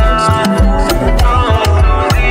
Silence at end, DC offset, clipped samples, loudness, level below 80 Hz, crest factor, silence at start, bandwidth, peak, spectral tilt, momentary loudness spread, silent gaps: 0 s; under 0.1%; under 0.1%; -11 LUFS; -12 dBFS; 10 dB; 0 s; 16.5 kHz; 0 dBFS; -6 dB/octave; 1 LU; none